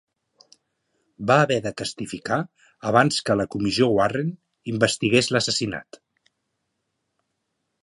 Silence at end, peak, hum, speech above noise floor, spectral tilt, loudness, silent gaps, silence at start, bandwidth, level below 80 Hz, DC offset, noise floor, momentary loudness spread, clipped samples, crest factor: 2 s; -2 dBFS; none; 55 dB; -4.5 dB/octave; -22 LUFS; none; 1.2 s; 11.5 kHz; -58 dBFS; under 0.1%; -77 dBFS; 13 LU; under 0.1%; 22 dB